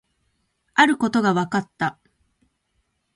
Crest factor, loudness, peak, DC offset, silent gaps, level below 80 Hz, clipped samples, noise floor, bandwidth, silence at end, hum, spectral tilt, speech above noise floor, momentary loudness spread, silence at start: 22 dB; -21 LUFS; -2 dBFS; under 0.1%; none; -62 dBFS; under 0.1%; -71 dBFS; 11.5 kHz; 1.25 s; none; -5 dB/octave; 51 dB; 10 LU; 0.75 s